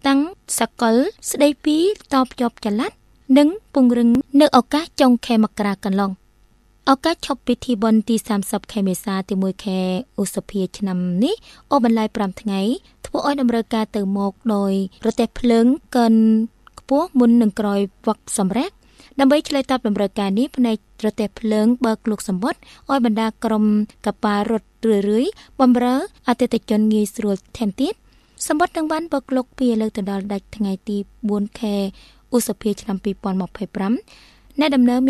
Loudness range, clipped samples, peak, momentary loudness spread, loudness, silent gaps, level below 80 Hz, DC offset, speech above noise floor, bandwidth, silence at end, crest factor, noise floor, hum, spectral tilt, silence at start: 6 LU; under 0.1%; 0 dBFS; 9 LU; -20 LUFS; none; -50 dBFS; under 0.1%; 36 dB; 13.5 kHz; 0 s; 18 dB; -55 dBFS; none; -5.5 dB/octave; 0.05 s